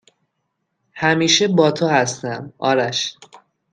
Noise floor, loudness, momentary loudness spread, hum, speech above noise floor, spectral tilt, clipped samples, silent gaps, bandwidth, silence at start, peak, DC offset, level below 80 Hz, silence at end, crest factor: -74 dBFS; -18 LUFS; 12 LU; none; 56 dB; -3.5 dB/octave; under 0.1%; none; 10.5 kHz; 0.95 s; 0 dBFS; under 0.1%; -62 dBFS; 0.35 s; 20 dB